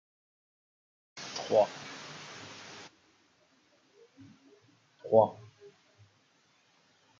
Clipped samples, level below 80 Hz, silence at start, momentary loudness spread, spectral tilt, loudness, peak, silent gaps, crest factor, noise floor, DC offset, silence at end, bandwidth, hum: under 0.1%; -86 dBFS; 1.15 s; 25 LU; -4.5 dB/octave; -31 LUFS; -8 dBFS; none; 28 dB; -69 dBFS; under 0.1%; 1.85 s; 7.6 kHz; none